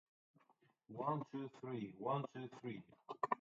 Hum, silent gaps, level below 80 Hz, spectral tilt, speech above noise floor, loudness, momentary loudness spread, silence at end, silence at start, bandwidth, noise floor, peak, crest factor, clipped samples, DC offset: none; none; -88 dBFS; -6.5 dB/octave; 31 dB; -46 LUFS; 11 LU; 0.05 s; 0.9 s; 7.4 kHz; -76 dBFS; -22 dBFS; 24 dB; under 0.1%; under 0.1%